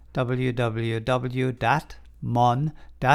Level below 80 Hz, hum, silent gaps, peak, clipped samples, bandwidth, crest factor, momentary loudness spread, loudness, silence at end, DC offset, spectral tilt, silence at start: -46 dBFS; none; none; -4 dBFS; under 0.1%; 12 kHz; 20 dB; 6 LU; -25 LUFS; 0 s; under 0.1%; -7 dB/octave; 0.15 s